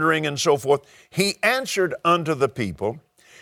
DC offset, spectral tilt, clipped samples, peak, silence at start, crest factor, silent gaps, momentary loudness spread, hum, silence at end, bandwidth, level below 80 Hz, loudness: under 0.1%; -4 dB/octave; under 0.1%; -4 dBFS; 0 s; 18 dB; none; 9 LU; none; 0.4 s; 18 kHz; -58 dBFS; -22 LUFS